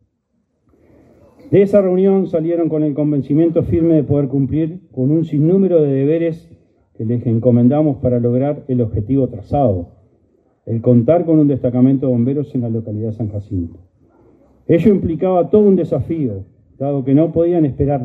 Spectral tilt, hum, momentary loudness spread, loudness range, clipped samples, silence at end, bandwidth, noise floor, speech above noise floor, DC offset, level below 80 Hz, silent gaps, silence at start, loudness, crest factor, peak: -11.5 dB/octave; none; 11 LU; 3 LU; under 0.1%; 0 s; 4.1 kHz; -66 dBFS; 51 dB; under 0.1%; -42 dBFS; none; 1.45 s; -15 LUFS; 16 dB; 0 dBFS